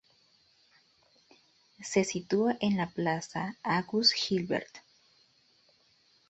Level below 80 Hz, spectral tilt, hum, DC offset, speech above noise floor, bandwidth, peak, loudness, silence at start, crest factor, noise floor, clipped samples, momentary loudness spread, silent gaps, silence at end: -70 dBFS; -4 dB/octave; none; under 0.1%; 37 dB; 8.2 kHz; -10 dBFS; -30 LUFS; 1.8 s; 22 dB; -67 dBFS; under 0.1%; 10 LU; none; 1.5 s